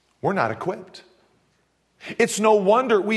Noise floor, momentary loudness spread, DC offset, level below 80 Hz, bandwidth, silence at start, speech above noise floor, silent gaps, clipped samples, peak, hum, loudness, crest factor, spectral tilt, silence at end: -66 dBFS; 18 LU; under 0.1%; -70 dBFS; 12.5 kHz; 0.25 s; 46 dB; none; under 0.1%; -4 dBFS; none; -21 LUFS; 18 dB; -4.5 dB/octave; 0 s